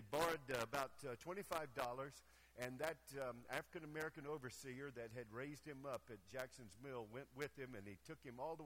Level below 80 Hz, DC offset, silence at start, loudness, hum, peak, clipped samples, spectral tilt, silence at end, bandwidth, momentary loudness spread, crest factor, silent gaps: -74 dBFS; under 0.1%; 0 s; -50 LUFS; none; -26 dBFS; under 0.1%; -4.5 dB/octave; 0 s; 16.5 kHz; 10 LU; 22 dB; none